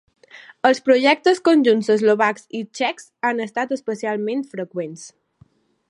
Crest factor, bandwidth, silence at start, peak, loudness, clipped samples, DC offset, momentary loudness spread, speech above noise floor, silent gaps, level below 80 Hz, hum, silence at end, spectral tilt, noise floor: 18 dB; 11.5 kHz; 0.35 s; -2 dBFS; -19 LUFS; under 0.1%; under 0.1%; 14 LU; 37 dB; none; -74 dBFS; none; 0.8 s; -4.5 dB/octave; -56 dBFS